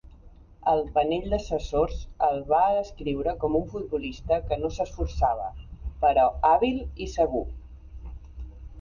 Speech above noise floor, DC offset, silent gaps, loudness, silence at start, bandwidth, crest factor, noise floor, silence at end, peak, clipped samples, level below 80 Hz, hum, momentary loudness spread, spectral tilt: 24 dB; under 0.1%; none; -26 LUFS; 0.05 s; 7.2 kHz; 18 dB; -50 dBFS; 0 s; -8 dBFS; under 0.1%; -38 dBFS; none; 22 LU; -6.5 dB/octave